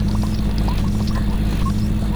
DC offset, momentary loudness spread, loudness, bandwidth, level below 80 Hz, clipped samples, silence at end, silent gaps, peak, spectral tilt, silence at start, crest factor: under 0.1%; 1 LU; -21 LUFS; over 20 kHz; -22 dBFS; under 0.1%; 0 s; none; -8 dBFS; -7 dB/octave; 0 s; 10 dB